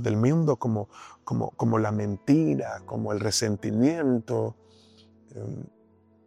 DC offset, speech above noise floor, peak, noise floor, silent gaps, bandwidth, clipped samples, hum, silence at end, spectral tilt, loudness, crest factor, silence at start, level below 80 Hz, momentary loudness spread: under 0.1%; 34 dB; -10 dBFS; -60 dBFS; none; 14.5 kHz; under 0.1%; none; 0.6 s; -6 dB/octave; -26 LUFS; 16 dB; 0 s; -62 dBFS; 17 LU